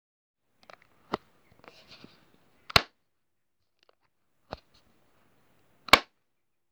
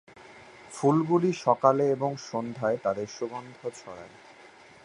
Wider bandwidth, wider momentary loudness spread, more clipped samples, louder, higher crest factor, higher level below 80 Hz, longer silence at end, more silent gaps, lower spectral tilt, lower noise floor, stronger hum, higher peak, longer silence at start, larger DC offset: first, over 20 kHz vs 11 kHz; first, 25 LU vs 21 LU; neither; about the same, -25 LUFS vs -27 LUFS; first, 32 dB vs 22 dB; first, -58 dBFS vs -70 dBFS; about the same, 0.7 s vs 0.75 s; neither; second, -2 dB/octave vs -6.5 dB/octave; first, -84 dBFS vs -52 dBFS; neither; about the same, -4 dBFS vs -6 dBFS; first, 1.1 s vs 0.2 s; neither